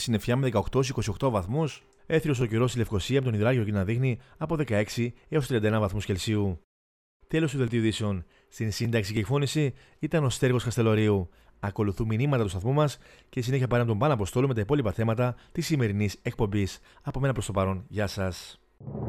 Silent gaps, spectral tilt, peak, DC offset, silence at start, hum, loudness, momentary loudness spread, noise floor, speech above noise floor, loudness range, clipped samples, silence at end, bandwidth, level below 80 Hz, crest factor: 6.64-7.20 s; -6.5 dB/octave; -10 dBFS; under 0.1%; 0 s; none; -28 LUFS; 8 LU; under -90 dBFS; over 63 dB; 3 LU; under 0.1%; 0 s; 15 kHz; -48 dBFS; 16 dB